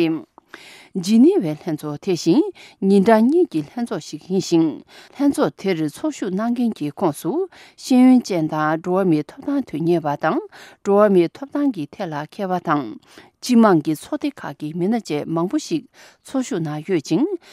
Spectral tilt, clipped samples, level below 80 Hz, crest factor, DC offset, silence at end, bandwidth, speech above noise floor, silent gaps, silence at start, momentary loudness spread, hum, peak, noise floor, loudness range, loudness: -6.5 dB/octave; under 0.1%; -66 dBFS; 18 dB; under 0.1%; 0.15 s; 14 kHz; 24 dB; none; 0 s; 13 LU; none; -2 dBFS; -43 dBFS; 4 LU; -20 LUFS